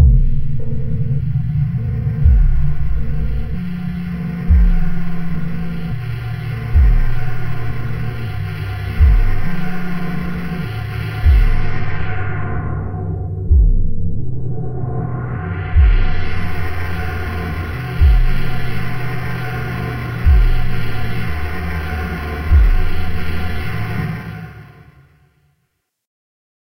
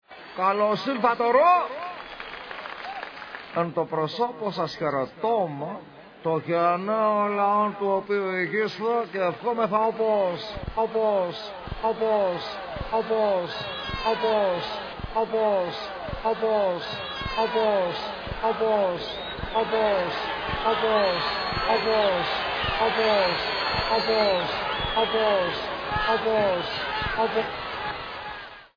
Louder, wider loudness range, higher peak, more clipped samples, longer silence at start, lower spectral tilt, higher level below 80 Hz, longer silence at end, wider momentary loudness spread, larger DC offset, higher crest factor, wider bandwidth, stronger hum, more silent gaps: first, -20 LUFS vs -25 LUFS; about the same, 2 LU vs 4 LU; first, 0 dBFS vs -6 dBFS; neither; about the same, 0 s vs 0.1 s; first, -8 dB/octave vs -6 dB/octave; first, -18 dBFS vs -48 dBFS; first, 2.1 s vs 0.1 s; about the same, 9 LU vs 11 LU; neither; about the same, 14 dB vs 18 dB; first, 16 kHz vs 5.4 kHz; neither; neither